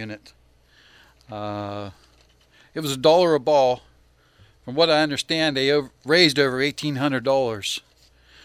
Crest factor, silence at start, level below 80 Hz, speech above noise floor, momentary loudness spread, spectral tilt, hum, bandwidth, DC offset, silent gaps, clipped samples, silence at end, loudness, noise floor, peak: 22 dB; 0 s; -58 dBFS; 36 dB; 18 LU; -4.5 dB/octave; none; 16 kHz; under 0.1%; none; under 0.1%; 0.65 s; -21 LUFS; -58 dBFS; -2 dBFS